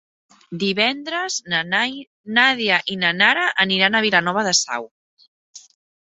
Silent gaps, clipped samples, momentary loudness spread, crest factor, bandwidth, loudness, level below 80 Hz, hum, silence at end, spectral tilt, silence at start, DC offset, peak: 2.07-2.24 s, 4.91-5.17 s, 5.28-5.53 s; under 0.1%; 10 LU; 20 dB; 8.4 kHz; -18 LUFS; -66 dBFS; none; 0.55 s; -2 dB/octave; 0.5 s; under 0.1%; -2 dBFS